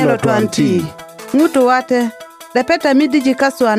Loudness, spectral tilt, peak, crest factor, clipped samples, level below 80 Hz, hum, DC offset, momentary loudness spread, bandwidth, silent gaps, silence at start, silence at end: -14 LUFS; -5.5 dB/octave; -2 dBFS; 12 dB; under 0.1%; -54 dBFS; none; under 0.1%; 9 LU; 16 kHz; none; 0 s; 0 s